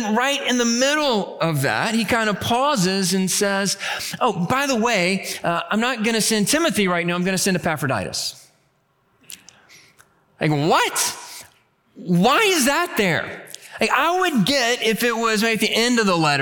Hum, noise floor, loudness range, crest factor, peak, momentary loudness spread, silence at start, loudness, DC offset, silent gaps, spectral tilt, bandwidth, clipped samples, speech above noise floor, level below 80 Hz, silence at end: none; -64 dBFS; 6 LU; 16 dB; -4 dBFS; 8 LU; 0 s; -19 LUFS; under 0.1%; none; -3.5 dB/octave; 19 kHz; under 0.1%; 44 dB; -56 dBFS; 0 s